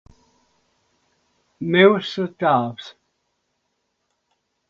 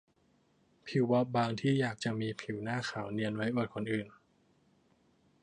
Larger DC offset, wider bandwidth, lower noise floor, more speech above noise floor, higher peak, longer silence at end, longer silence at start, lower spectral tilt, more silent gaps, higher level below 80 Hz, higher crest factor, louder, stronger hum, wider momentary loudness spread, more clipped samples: neither; second, 7.2 kHz vs 10 kHz; about the same, -73 dBFS vs -71 dBFS; first, 55 dB vs 38 dB; first, 0 dBFS vs -18 dBFS; first, 1.8 s vs 1.3 s; first, 1.6 s vs 0.85 s; about the same, -7 dB/octave vs -6.5 dB/octave; neither; first, -64 dBFS vs -72 dBFS; first, 24 dB vs 18 dB; first, -19 LUFS vs -34 LUFS; neither; first, 20 LU vs 8 LU; neither